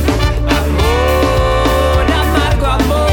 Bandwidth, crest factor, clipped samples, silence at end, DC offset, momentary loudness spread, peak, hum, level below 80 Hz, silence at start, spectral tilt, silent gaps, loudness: 18.5 kHz; 10 dB; under 0.1%; 0 s; under 0.1%; 2 LU; -2 dBFS; none; -16 dBFS; 0 s; -5.5 dB/octave; none; -13 LUFS